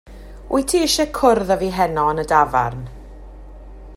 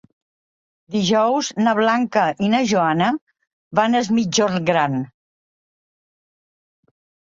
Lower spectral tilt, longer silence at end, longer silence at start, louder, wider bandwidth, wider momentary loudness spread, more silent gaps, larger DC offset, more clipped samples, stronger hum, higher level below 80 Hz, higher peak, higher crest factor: about the same, -4 dB/octave vs -4.5 dB/octave; second, 0 s vs 2.2 s; second, 0.05 s vs 0.9 s; about the same, -18 LUFS vs -19 LUFS; first, 16 kHz vs 7.8 kHz; about the same, 8 LU vs 6 LU; second, none vs 3.21-3.27 s, 3.53-3.71 s; neither; neither; neither; first, -38 dBFS vs -62 dBFS; about the same, -2 dBFS vs -2 dBFS; about the same, 18 dB vs 18 dB